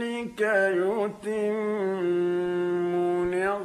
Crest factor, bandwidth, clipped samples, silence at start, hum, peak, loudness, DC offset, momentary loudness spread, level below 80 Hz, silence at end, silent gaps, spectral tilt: 14 dB; 11 kHz; under 0.1%; 0 s; none; -12 dBFS; -26 LUFS; under 0.1%; 6 LU; -62 dBFS; 0 s; none; -6.5 dB/octave